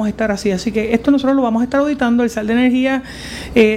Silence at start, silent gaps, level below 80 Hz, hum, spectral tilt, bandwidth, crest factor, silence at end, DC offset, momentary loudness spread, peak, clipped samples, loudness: 0 s; none; -40 dBFS; none; -5.5 dB/octave; 13.5 kHz; 14 dB; 0 s; under 0.1%; 5 LU; 0 dBFS; under 0.1%; -16 LUFS